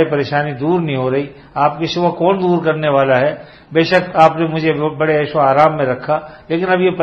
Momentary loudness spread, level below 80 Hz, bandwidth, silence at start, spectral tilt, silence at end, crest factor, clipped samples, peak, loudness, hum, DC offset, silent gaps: 8 LU; -50 dBFS; 8.6 kHz; 0 s; -7.5 dB/octave; 0 s; 14 dB; under 0.1%; 0 dBFS; -15 LUFS; none; under 0.1%; none